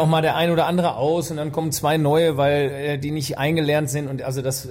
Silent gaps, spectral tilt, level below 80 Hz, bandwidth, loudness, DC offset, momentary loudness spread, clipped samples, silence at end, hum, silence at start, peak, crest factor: none; -5.5 dB/octave; -52 dBFS; 16.5 kHz; -21 LUFS; under 0.1%; 7 LU; under 0.1%; 0 s; none; 0 s; -8 dBFS; 12 dB